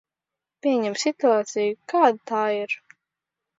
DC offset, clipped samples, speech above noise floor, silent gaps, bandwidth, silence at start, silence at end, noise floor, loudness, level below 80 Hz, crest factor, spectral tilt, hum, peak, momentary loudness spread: under 0.1%; under 0.1%; 65 dB; none; 7.8 kHz; 0.65 s; 0.85 s; -87 dBFS; -23 LUFS; -80 dBFS; 20 dB; -3.5 dB/octave; none; -4 dBFS; 8 LU